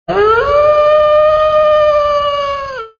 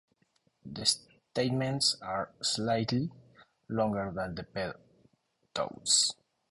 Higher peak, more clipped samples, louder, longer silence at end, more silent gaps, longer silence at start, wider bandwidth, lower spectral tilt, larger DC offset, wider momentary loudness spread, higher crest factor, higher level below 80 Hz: first, 0 dBFS vs -10 dBFS; neither; first, -10 LUFS vs -31 LUFS; second, 0.1 s vs 0.4 s; neither; second, 0.1 s vs 0.65 s; second, 6.8 kHz vs 11.5 kHz; first, -5 dB/octave vs -3 dB/octave; neither; second, 7 LU vs 14 LU; second, 10 dB vs 22 dB; first, -36 dBFS vs -62 dBFS